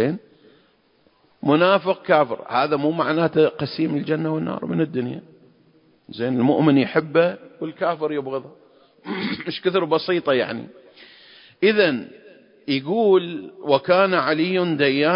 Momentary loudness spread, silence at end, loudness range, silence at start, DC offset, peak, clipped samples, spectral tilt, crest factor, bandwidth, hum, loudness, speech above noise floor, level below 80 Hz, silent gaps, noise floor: 14 LU; 0 s; 4 LU; 0 s; under 0.1%; -2 dBFS; under 0.1%; -11 dB/octave; 20 dB; 5.4 kHz; none; -21 LUFS; 40 dB; -66 dBFS; none; -60 dBFS